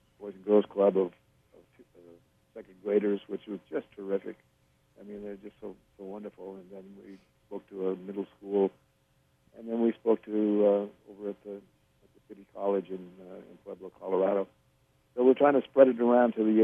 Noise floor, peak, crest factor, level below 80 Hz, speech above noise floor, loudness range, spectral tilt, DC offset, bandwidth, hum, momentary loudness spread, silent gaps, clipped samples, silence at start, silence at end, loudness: -69 dBFS; -6 dBFS; 24 dB; -74 dBFS; 40 dB; 13 LU; -9 dB/octave; under 0.1%; 3.7 kHz; none; 23 LU; none; under 0.1%; 0.2 s; 0 s; -28 LUFS